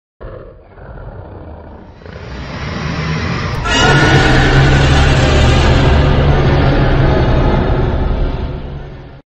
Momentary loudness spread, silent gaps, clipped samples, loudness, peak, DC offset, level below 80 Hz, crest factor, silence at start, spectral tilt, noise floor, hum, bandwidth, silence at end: 22 LU; none; under 0.1%; -12 LUFS; 0 dBFS; under 0.1%; -18 dBFS; 12 dB; 0.2 s; -6 dB/octave; -34 dBFS; none; 8.6 kHz; 0.1 s